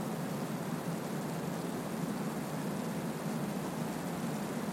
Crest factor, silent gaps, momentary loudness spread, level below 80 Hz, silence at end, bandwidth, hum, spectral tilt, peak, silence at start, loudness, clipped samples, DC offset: 14 dB; none; 1 LU; -66 dBFS; 0 s; 16.5 kHz; none; -5.5 dB/octave; -24 dBFS; 0 s; -37 LUFS; under 0.1%; under 0.1%